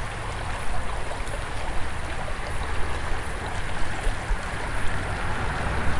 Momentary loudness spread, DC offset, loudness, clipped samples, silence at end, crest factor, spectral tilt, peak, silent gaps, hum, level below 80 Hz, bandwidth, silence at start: 4 LU; under 0.1%; -31 LUFS; under 0.1%; 0 s; 14 dB; -4.5 dB/octave; -10 dBFS; none; none; -32 dBFS; 11.5 kHz; 0 s